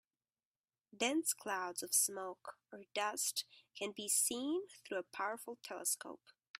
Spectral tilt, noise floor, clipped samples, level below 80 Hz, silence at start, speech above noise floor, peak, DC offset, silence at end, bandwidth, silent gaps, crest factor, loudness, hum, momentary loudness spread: -0.5 dB/octave; under -90 dBFS; under 0.1%; -88 dBFS; 0.95 s; over 50 dB; -20 dBFS; under 0.1%; 0.45 s; 16 kHz; none; 22 dB; -38 LUFS; none; 17 LU